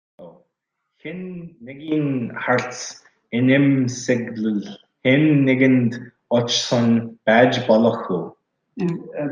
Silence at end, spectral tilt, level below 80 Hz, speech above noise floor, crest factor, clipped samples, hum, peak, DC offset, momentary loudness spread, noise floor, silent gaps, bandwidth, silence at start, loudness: 0 s; -5.5 dB/octave; -66 dBFS; 58 dB; 18 dB; under 0.1%; none; -2 dBFS; under 0.1%; 19 LU; -77 dBFS; none; 9.4 kHz; 0.2 s; -19 LUFS